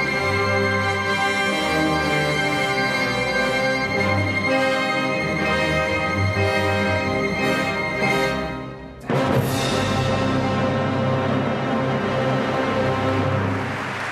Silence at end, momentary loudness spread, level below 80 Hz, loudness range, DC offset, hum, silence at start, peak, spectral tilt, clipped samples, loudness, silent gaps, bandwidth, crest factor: 0 s; 3 LU; -44 dBFS; 2 LU; under 0.1%; none; 0 s; -8 dBFS; -5.5 dB/octave; under 0.1%; -21 LUFS; none; 14 kHz; 14 dB